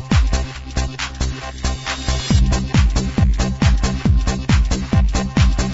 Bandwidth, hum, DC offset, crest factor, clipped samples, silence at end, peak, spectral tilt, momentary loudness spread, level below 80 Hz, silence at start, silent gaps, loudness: 8 kHz; none; under 0.1%; 16 dB; under 0.1%; 0 s; -2 dBFS; -5.5 dB/octave; 8 LU; -20 dBFS; 0 s; none; -19 LUFS